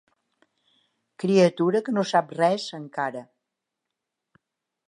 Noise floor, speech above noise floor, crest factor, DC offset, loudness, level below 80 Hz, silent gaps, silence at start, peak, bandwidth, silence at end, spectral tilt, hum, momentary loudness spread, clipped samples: -84 dBFS; 61 dB; 20 dB; under 0.1%; -24 LUFS; -78 dBFS; none; 1.2 s; -8 dBFS; 10.5 kHz; 1.65 s; -6 dB/octave; none; 11 LU; under 0.1%